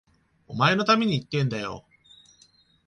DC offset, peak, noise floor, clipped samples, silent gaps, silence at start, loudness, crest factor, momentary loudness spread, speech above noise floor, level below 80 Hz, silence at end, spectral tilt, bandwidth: under 0.1%; -8 dBFS; -60 dBFS; under 0.1%; none; 0.5 s; -24 LUFS; 20 dB; 16 LU; 37 dB; -60 dBFS; 1.05 s; -6 dB/octave; 10 kHz